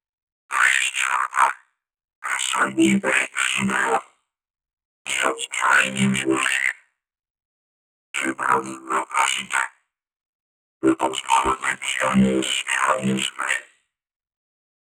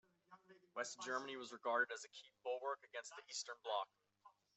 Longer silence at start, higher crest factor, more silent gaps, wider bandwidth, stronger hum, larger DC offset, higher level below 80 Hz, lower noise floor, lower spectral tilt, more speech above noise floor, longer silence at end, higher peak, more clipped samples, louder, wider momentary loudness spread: first, 0.5 s vs 0.3 s; about the same, 20 dB vs 22 dB; first, 2.15-2.22 s, 4.73-4.77 s, 4.85-5.05 s, 7.30-7.35 s, 7.45-8.14 s, 10.26-10.80 s vs none; first, 17.5 kHz vs 8.2 kHz; neither; neither; first, -56 dBFS vs under -90 dBFS; second, -55 dBFS vs -71 dBFS; first, -3 dB/octave vs -0.5 dB/octave; first, 34 dB vs 25 dB; first, 1.35 s vs 0.25 s; first, -4 dBFS vs -26 dBFS; neither; first, -21 LUFS vs -46 LUFS; second, 8 LU vs 14 LU